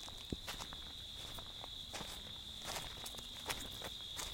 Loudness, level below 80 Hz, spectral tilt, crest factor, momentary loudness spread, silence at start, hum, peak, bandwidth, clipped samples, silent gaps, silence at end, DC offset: -45 LUFS; -58 dBFS; -2 dB/octave; 26 dB; 4 LU; 0 s; none; -20 dBFS; 17 kHz; under 0.1%; none; 0 s; under 0.1%